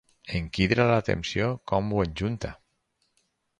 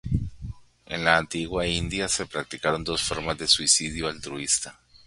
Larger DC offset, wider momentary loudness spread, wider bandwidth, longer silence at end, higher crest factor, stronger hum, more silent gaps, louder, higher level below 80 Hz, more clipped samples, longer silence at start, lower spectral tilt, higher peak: neither; about the same, 11 LU vs 13 LU; about the same, 10.5 kHz vs 11.5 kHz; first, 1.05 s vs 0.1 s; about the same, 22 dB vs 26 dB; neither; neither; second, -27 LUFS vs -24 LUFS; about the same, -46 dBFS vs -44 dBFS; neither; first, 0.25 s vs 0.05 s; first, -6.5 dB/octave vs -2.5 dB/octave; second, -6 dBFS vs -2 dBFS